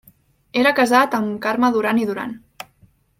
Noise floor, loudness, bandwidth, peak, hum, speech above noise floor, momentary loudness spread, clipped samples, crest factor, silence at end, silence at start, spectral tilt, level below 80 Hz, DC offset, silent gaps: -56 dBFS; -18 LUFS; 16.5 kHz; -2 dBFS; none; 38 dB; 23 LU; under 0.1%; 18 dB; 0.8 s; 0.55 s; -4.5 dB/octave; -62 dBFS; under 0.1%; none